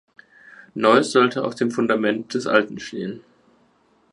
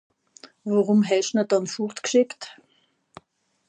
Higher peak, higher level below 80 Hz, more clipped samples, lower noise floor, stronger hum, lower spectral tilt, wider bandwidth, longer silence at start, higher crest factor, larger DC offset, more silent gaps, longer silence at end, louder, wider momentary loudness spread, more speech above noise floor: first, -2 dBFS vs -8 dBFS; first, -68 dBFS vs -78 dBFS; neither; second, -60 dBFS vs -66 dBFS; neither; about the same, -5 dB/octave vs -5 dB/octave; first, 11.5 kHz vs 9.6 kHz; first, 0.75 s vs 0.45 s; about the same, 20 dB vs 16 dB; neither; neither; second, 0.95 s vs 1.15 s; first, -20 LUFS vs -23 LUFS; about the same, 15 LU vs 16 LU; second, 40 dB vs 44 dB